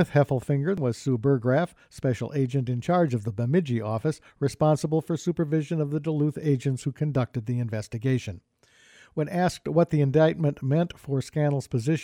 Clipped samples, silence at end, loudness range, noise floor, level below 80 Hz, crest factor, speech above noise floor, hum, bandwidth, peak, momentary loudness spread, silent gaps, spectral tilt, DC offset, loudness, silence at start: under 0.1%; 0 s; 3 LU; -56 dBFS; -58 dBFS; 16 dB; 31 dB; none; 13 kHz; -8 dBFS; 7 LU; none; -7.5 dB/octave; under 0.1%; -26 LUFS; 0 s